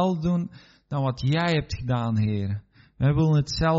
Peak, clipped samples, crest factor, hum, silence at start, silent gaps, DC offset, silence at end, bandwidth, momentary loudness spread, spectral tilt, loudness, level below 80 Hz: -10 dBFS; under 0.1%; 14 dB; none; 0 s; none; under 0.1%; 0 s; 7.8 kHz; 10 LU; -6.5 dB/octave; -25 LUFS; -44 dBFS